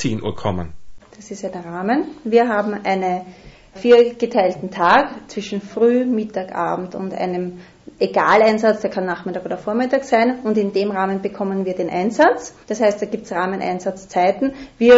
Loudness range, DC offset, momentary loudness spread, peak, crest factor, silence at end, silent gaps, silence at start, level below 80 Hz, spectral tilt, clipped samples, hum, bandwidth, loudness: 4 LU; under 0.1%; 12 LU; -2 dBFS; 16 dB; 0 s; none; 0 s; -50 dBFS; -6 dB/octave; under 0.1%; none; 8 kHz; -19 LUFS